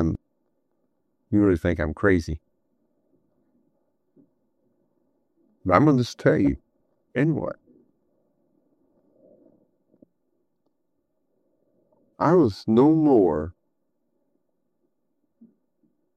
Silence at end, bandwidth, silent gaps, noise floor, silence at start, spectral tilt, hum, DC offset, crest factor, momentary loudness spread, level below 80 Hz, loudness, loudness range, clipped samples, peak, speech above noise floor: 2.65 s; 9.2 kHz; none; -76 dBFS; 0 s; -8 dB/octave; none; under 0.1%; 24 dB; 17 LU; -50 dBFS; -22 LUFS; 10 LU; under 0.1%; -2 dBFS; 56 dB